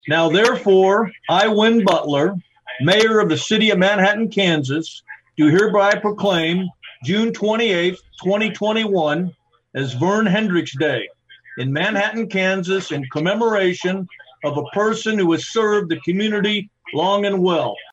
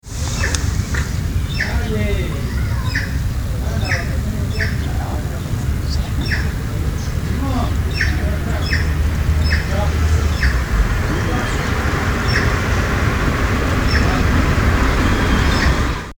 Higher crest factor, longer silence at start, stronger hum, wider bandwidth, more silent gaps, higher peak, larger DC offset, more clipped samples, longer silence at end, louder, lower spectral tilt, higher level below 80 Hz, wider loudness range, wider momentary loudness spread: about the same, 16 dB vs 18 dB; about the same, 0.05 s vs 0.05 s; neither; second, 12 kHz vs over 20 kHz; neither; about the same, -2 dBFS vs 0 dBFS; neither; neither; about the same, 0.1 s vs 0.05 s; about the same, -18 LUFS vs -19 LUFS; about the same, -5 dB/octave vs -5.5 dB/octave; second, -62 dBFS vs -20 dBFS; about the same, 4 LU vs 4 LU; first, 12 LU vs 6 LU